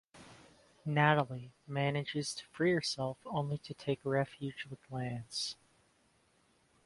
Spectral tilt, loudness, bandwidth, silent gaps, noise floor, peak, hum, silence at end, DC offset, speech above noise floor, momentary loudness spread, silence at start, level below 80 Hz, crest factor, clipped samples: -5 dB/octave; -35 LUFS; 11.5 kHz; none; -71 dBFS; -12 dBFS; none; 1.35 s; under 0.1%; 36 dB; 14 LU; 0.15 s; -72 dBFS; 24 dB; under 0.1%